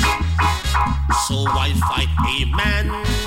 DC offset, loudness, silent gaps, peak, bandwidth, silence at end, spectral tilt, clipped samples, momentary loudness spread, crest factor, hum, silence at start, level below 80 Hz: under 0.1%; -19 LUFS; none; -4 dBFS; 16.5 kHz; 0 s; -4 dB/octave; under 0.1%; 1 LU; 14 dB; none; 0 s; -22 dBFS